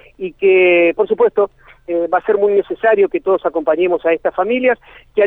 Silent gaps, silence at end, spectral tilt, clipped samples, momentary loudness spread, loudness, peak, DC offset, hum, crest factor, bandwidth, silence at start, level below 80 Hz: none; 0 s; -8 dB/octave; under 0.1%; 9 LU; -15 LUFS; -2 dBFS; under 0.1%; none; 12 dB; 3.9 kHz; 0.2 s; -52 dBFS